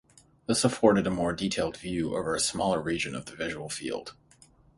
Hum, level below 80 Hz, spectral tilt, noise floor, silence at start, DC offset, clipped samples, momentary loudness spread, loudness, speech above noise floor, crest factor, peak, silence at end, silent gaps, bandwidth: none; -54 dBFS; -4 dB/octave; -59 dBFS; 0.5 s; under 0.1%; under 0.1%; 12 LU; -28 LUFS; 31 dB; 24 dB; -6 dBFS; 0.65 s; none; 11.5 kHz